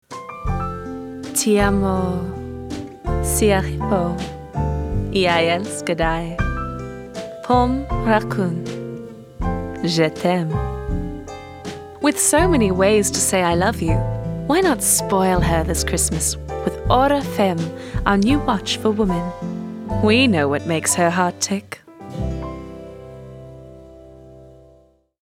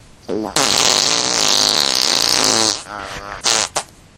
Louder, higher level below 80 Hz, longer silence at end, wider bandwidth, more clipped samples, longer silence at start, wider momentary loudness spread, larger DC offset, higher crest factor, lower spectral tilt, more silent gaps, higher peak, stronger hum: second, -19 LUFS vs -14 LUFS; first, -32 dBFS vs -48 dBFS; first, 0.7 s vs 0.3 s; second, 17 kHz vs over 20 kHz; neither; second, 0.1 s vs 0.3 s; about the same, 16 LU vs 14 LU; neither; about the same, 20 dB vs 18 dB; first, -4.5 dB/octave vs -0.5 dB/octave; neither; about the same, 0 dBFS vs 0 dBFS; neither